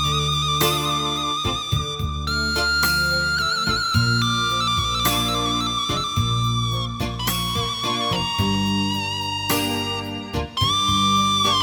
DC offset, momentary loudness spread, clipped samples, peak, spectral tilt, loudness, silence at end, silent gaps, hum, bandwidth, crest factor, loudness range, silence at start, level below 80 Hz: under 0.1%; 6 LU; under 0.1%; -6 dBFS; -3.5 dB/octave; -21 LUFS; 0 s; none; none; over 20 kHz; 16 dB; 3 LU; 0 s; -36 dBFS